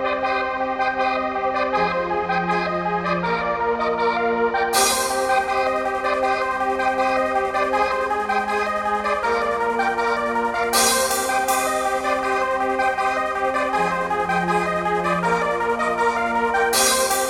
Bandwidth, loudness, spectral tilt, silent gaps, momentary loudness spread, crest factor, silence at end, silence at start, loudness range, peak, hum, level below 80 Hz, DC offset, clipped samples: 17 kHz; -20 LUFS; -2.5 dB/octave; none; 5 LU; 16 dB; 0 s; 0 s; 1 LU; -4 dBFS; none; -48 dBFS; under 0.1%; under 0.1%